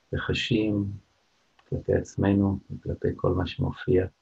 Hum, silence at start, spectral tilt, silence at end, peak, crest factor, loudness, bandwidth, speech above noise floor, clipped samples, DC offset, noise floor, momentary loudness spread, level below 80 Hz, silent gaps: none; 0.1 s; -7 dB/octave; 0.15 s; -8 dBFS; 18 dB; -27 LUFS; 8 kHz; 42 dB; under 0.1%; under 0.1%; -68 dBFS; 10 LU; -48 dBFS; none